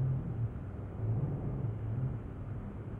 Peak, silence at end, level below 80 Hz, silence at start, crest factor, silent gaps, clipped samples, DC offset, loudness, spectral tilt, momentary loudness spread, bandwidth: -24 dBFS; 0 s; -48 dBFS; 0 s; 12 dB; none; under 0.1%; under 0.1%; -38 LUFS; -11.5 dB/octave; 8 LU; 3.3 kHz